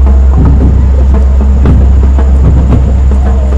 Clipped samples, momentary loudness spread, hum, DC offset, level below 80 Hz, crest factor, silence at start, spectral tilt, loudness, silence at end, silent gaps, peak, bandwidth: 4%; 2 LU; none; 1%; -4 dBFS; 4 dB; 0 s; -9.5 dB/octave; -7 LUFS; 0 s; none; 0 dBFS; 3.2 kHz